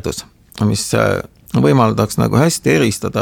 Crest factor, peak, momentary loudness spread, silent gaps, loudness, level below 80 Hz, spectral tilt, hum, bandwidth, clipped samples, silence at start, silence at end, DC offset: 16 dB; 0 dBFS; 9 LU; none; -15 LUFS; -42 dBFS; -5.5 dB/octave; none; 18 kHz; under 0.1%; 0.05 s; 0 s; under 0.1%